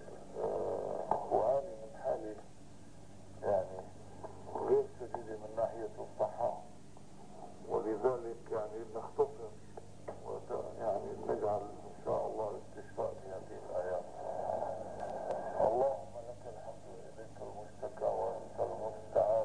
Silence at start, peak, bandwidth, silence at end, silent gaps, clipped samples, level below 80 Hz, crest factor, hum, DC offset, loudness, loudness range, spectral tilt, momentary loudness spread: 0 s; -16 dBFS; 10.5 kHz; 0 s; none; under 0.1%; -66 dBFS; 22 dB; 50 Hz at -60 dBFS; 0.3%; -38 LUFS; 3 LU; -7 dB/octave; 18 LU